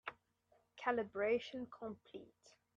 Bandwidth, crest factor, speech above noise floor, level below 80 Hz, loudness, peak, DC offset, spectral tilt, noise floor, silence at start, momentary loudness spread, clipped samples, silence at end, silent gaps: 7.6 kHz; 18 dB; 35 dB; -82 dBFS; -41 LUFS; -26 dBFS; under 0.1%; -5.5 dB/octave; -77 dBFS; 0.05 s; 17 LU; under 0.1%; 0.25 s; none